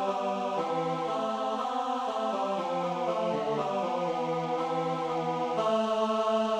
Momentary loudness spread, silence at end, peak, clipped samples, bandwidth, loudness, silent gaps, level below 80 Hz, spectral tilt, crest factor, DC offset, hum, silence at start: 3 LU; 0 s; -16 dBFS; under 0.1%; 11.5 kHz; -30 LUFS; none; -74 dBFS; -5.5 dB/octave; 12 dB; under 0.1%; none; 0 s